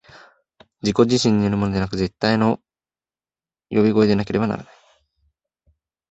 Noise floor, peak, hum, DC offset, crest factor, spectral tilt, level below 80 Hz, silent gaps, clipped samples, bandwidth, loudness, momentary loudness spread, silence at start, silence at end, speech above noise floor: under -90 dBFS; -2 dBFS; none; under 0.1%; 20 dB; -6 dB/octave; -48 dBFS; none; under 0.1%; 8.2 kHz; -20 LUFS; 9 LU; 0.85 s; 1.5 s; over 72 dB